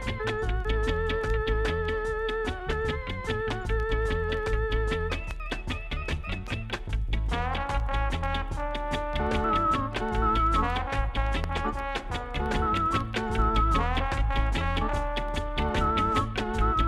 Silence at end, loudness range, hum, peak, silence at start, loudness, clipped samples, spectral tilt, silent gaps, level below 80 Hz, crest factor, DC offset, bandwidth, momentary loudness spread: 0 s; 4 LU; none; -12 dBFS; 0 s; -29 LUFS; under 0.1%; -6 dB/octave; none; -30 dBFS; 14 dB; under 0.1%; 11.5 kHz; 8 LU